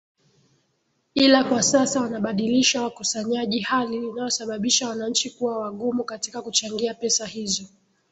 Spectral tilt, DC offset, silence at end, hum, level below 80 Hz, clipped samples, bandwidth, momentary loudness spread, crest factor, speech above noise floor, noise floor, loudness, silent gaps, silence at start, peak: -2.5 dB/octave; under 0.1%; 0.45 s; none; -64 dBFS; under 0.1%; 8.4 kHz; 9 LU; 20 dB; 47 dB; -70 dBFS; -23 LUFS; none; 1.15 s; -4 dBFS